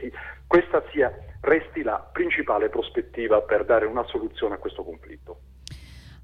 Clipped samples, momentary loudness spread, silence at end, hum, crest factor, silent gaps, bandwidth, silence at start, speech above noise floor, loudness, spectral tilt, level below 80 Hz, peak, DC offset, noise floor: under 0.1%; 21 LU; 0 s; none; 18 dB; none; 9.6 kHz; 0 s; 21 dB; -24 LUFS; -6.5 dB/octave; -48 dBFS; -6 dBFS; under 0.1%; -44 dBFS